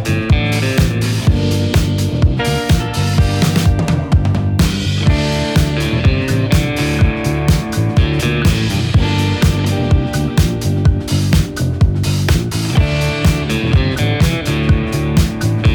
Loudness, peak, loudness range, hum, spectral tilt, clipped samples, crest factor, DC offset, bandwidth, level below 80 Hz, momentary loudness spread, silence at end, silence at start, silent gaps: -15 LUFS; -2 dBFS; 1 LU; none; -6 dB/octave; under 0.1%; 10 dB; under 0.1%; 19.5 kHz; -22 dBFS; 2 LU; 0 s; 0 s; none